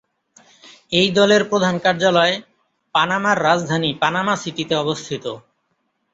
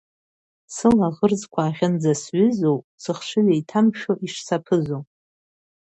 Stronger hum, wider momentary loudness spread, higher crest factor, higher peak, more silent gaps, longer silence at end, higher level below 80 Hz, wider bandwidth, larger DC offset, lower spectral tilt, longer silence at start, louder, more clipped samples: neither; first, 12 LU vs 9 LU; about the same, 18 dB vs 18 dB; first, 0 dBFS vs -4 dBFS; second, none vs 2.84-2.98 s; second, 0.75 s vs 0.9 s; about the same, -60 dBFS vs -58 dBFS; about the same, 8 kHz vs 8.6 kHz; neither; second, -4.5 dB/octave vs -6.5 dB/octave; about the same, 0.65 s vs 0.7 s; first, -18 LUFS vs -21 LUFS; neither